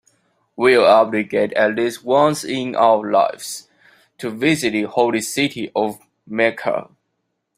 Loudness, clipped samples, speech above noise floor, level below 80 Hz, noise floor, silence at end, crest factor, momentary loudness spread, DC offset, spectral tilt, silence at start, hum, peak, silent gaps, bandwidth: -18 LUFS; under 0.1%; 56 dB; -62 dBFS; -73 dBFS; 0.75 s; 18 dB; 13 LU; under 0.1%; -4.5 dB/octave; 0.6 s; none; -2 dBFS; none; 16 kHz